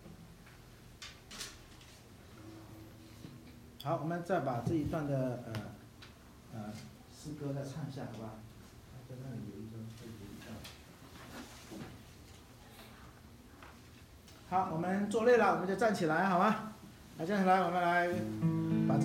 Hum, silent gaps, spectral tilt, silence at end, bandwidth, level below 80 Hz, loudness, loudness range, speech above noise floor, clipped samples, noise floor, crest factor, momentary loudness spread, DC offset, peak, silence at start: none; none; -6.5 dB/octave; 0 s; 16 kHz; -62 dBFS; -34 LUFS; 19 LU; 23 dB; under 0.1%; -56 dBFS; 20 dB; 25 LU; under 0.1%; -16 dBFS; 0 s